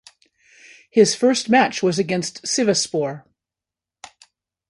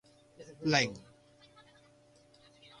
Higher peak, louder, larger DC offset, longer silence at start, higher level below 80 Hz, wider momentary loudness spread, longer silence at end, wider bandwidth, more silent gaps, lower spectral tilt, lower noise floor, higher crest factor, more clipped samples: first, -2 dBFS vs -12 dBFS; first, -19 LUFS vs -31 LUFS; neither; first, 0.95 s vs 0.4 s; about the same, -68 dBFS vs -70 dBFS; second, 9 LU vs 27 LU; second, 1.5 s vs 1.8 s; about the same, 11.5 kHz vs 11.5 kHz; neither; about the same, -3.5 dB/octave vs -4 dB/octave; first, -88 dBFS vs -63 dBFS; second, 20 dB vs 26 dB; neither